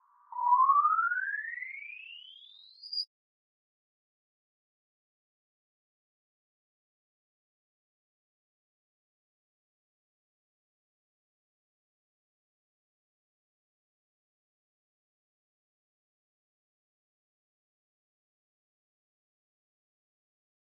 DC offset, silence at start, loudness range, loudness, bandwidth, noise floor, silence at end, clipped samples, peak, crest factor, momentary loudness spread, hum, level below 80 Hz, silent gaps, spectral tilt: under 0.1%; 0.3 s; 14 LU; -29 LUFS; 4.9 kHz; -55 dBFS; 17.7 s; under 0.1%; -16 dBFS; 24 dB; 23 LU; none; under -90 dBFS; none; 12.5 dB/octave